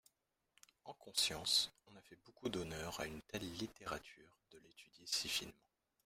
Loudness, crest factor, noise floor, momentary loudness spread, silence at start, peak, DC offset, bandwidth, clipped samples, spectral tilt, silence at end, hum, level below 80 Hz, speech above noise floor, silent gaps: -41 LUFS; 24 dB; -85 dBFS; 24 LU; 0.85 s; -22 dBFS; under 0.1%; 16 kHz; under 0.1%; -2 dB/octave; 0.55 s; none; -70 dBFS; 41 dB; none